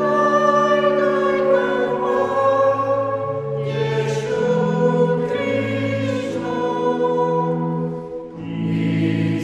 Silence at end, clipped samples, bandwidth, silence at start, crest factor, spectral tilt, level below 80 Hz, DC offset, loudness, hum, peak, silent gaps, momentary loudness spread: 0 s; under 0.1%; 9.8 kHz; 0 s; 14 dB; -7 dB/octave; -56 dBFS; under 0.1%; -19 LUFS; none; -4 dBFS; none; 8 LU